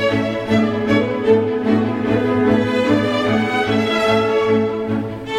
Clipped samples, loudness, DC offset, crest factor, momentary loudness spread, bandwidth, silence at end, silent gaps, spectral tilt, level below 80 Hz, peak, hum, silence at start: under 0.1%; -17 LUFS; under 0.1%; 14 dB; 3 LU; 11.5 kHz; 0 s; none; -6.5 dB/octave; -48 dBFS; -2 dBFS; none; 0 s